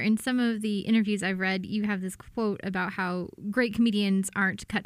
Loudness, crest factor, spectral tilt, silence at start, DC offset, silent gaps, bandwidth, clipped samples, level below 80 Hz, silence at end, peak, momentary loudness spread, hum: -28 LUFS; 16 dB; -5 dB/octave; 0 s; under 0.1%; none; 15 kHz; under 0.1%; -60 dBFS; 0 s; -12 dBFS; 6 LU; none